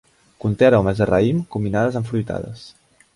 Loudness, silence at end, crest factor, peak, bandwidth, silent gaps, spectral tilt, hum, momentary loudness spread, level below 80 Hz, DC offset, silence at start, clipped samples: -19 LUFS; 0.45 s; 18 dB; -2 dBFS; 11.5 kHz; none; -8 dB/octave; none; 14 LU; -44 dBFS; under 0.1%; 0.45 s; under 0.1%